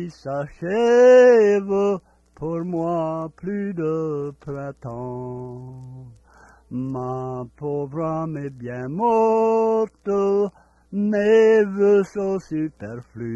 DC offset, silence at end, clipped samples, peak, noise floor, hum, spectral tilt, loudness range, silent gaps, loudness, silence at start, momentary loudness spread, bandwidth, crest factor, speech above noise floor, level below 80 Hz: under 0.1%; 0 s; under 0.1%; -6 dBFS; -51 dBFS; none; -7.5 dB/octave; 13 LU; none; -20 LUFS; 0 s; 18 LU; 7.8 kHz; 16 dB; 31 dB; -56 dBFS